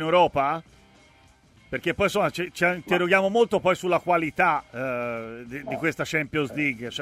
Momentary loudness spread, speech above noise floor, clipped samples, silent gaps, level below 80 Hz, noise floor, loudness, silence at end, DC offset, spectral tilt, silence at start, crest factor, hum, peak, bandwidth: 11 LU; 32 dB; under 0.1%; none; -56 dBFS; -56 dBFS; -24 LUFS; 0 s; under 0.1%; -5 dB/octave; 0 s; 18 dB; none; -6 dBFS; 16 kHz